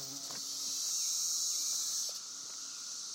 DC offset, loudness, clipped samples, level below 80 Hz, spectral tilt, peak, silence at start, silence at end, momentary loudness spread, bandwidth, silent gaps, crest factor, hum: under 0.1%; -34 LUFS; under 0.1%; under -90 dBFS; 2 dB/octave; -22 dBFS; 0 s; 0 s; 10 LU; 16.5 kHz; none; 16 dB; none